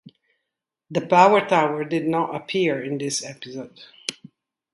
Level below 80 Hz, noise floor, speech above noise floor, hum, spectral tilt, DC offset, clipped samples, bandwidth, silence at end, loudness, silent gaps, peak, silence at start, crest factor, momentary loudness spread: -70 dBFS; -83 dBFS; 61 dB; none; -4.5 dB/octave; under 0.1%; under 0.1%; 11.5 kHz; 0.6 s; -21 LUFS; none; 0 dBFS; 0.9 s; 22 dB; 19 LU